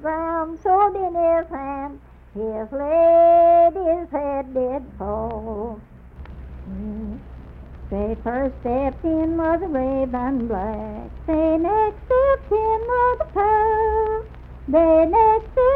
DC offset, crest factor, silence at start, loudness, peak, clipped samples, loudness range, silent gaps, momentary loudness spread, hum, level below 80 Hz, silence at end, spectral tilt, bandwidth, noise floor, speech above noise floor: under 0.1%; 14 dB; 0 s; -20 LUFS; -6 dBFS; under 0.1%; 11 LU; none; 18 LU; none; -38 dBFS; 0 s; -10 dB/octave; 4.1 kHz; -40 dBFS; 21 dB